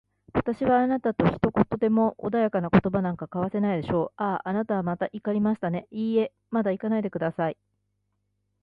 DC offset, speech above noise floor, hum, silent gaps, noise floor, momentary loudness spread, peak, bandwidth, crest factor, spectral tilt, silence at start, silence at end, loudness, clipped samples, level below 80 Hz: under 0.1%; 50 dB; 50 Hz at -50 dBFS; none; -75 dBFS; 7 LU; -4 dBFS; 5 kHz; 22 dB; -10 dB/octave; 0.35 s; 1.1 s; -26 LUFS; under 0.1%; -52 dBFS